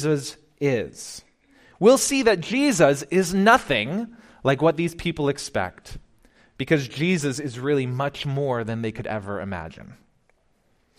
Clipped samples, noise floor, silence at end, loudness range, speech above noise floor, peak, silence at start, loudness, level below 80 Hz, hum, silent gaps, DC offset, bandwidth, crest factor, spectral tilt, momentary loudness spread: under 0.1%; -64 dBFS; 1.05 s; 7 LU; 42 dB; -4 dBFS; 0 s; -22 LUFS; -52 dBFS; none; none; under 0.1%; 15.5 kHz; 20 dB; -5 dB/octave; 15 LU